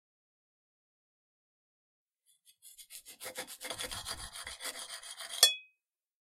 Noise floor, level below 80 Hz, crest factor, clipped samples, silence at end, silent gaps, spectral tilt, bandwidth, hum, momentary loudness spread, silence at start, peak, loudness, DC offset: -81 dBFS; -66 dBFS; 36 dB; under 0.1%; 0.55 s; none; 1.5 dB/octave; 16 kHz; none; 24 LU; 2.65 s; -4 dBFS; -33 LUFS; under 0.1%